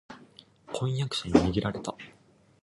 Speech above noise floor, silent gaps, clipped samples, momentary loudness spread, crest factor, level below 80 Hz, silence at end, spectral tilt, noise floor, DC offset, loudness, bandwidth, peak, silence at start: 28 dB; none; under 0.1%; 24 LU; 24 dB; -48 dBFS; 0.5 s; -6 dB/octave; -56 dBFS; under 0.1%; -29 LUFS; 11.5 kHz; -6 dBFS; 0.1 s